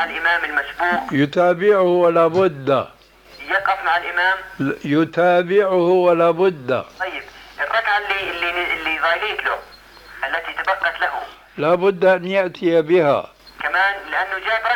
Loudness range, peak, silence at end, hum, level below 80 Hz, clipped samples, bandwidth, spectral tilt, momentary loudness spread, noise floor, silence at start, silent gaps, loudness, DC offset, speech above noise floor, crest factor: 4 LU; -4 dBFS; 0 s; none; -54 dBFS; under 0.1%; 18 kHz; -6 dB/octave; 10 LU; -43 dBFS; 0 s; none; -18 LUFS; under 0.1%; 25 dB; 14 dB